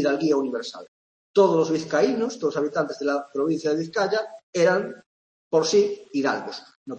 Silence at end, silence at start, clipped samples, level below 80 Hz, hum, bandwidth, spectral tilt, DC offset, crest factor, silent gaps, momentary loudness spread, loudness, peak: 0 s; 0 s; under 0.1%; -72 dBFS; none; 8.6 kHz; -5 dB/octave; under 0.1%; 16 dB; 0.88-1.34 s, 4.43-4.53 s, 5.06-5.51 s, 6.75-6.86 s; 11 LU; -23 LUFS; -6 dBFS